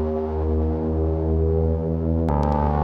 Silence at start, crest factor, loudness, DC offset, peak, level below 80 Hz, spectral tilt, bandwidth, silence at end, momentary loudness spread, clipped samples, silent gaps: 0 s; 14 dB; -23 LUFS; under 0.1%; -8 dBFS; -26 dBFS; -11 dB/octave; 3.7 kHz; 0 s; 3 LU; under 0.1%; none